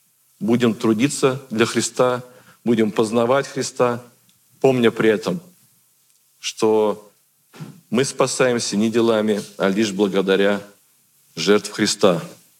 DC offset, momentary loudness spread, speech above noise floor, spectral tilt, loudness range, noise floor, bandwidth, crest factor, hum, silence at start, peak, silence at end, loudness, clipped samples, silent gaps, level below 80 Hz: under 0.1%; 11 LU; 41 dB; -4.5 dB/octave; 3 LU; -59 dBFS; 16.5 kHz; 20 dB; none; 0.4 s; 0 dBFS; 0.25 s; -19 LUFS; under 0.1%; none; -72 dBFS